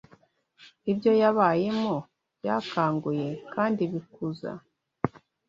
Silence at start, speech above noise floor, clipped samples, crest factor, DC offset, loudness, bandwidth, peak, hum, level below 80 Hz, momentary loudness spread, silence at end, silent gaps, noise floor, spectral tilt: 0.6 s; 35 dB; under 0.1%; 20 dB; under 0.1%; -27 LUFS; 7.4 kHz; -6 dBFS; none; -66 dBFS; 14 LU; 0.4 s; none; -61 dBFS; -8 dB/octave